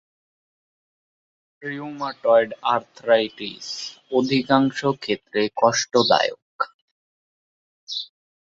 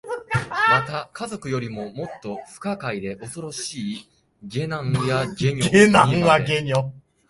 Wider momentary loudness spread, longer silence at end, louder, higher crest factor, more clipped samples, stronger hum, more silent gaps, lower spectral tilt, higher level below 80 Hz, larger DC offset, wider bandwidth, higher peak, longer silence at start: second, 13 LU vs 17 LU; about the same, 0.4 s vs 0.3 s; about the same, -22 LUFS vs -21 LUFS; about the same, 22 dB vs 22 dB; neither; neither; first, 6.42-6.59 s, 6.74-7.87 s vs none; about the same, -4 dB/octave vs -5 dB/octave; second, -66 dBFS vs -52 dBFS; neither; second, 7.8 kHz vs 11.5 kHz; about the same, -2 dBFS vs 0 dBFS; first, 1.6 s vs 0.05 s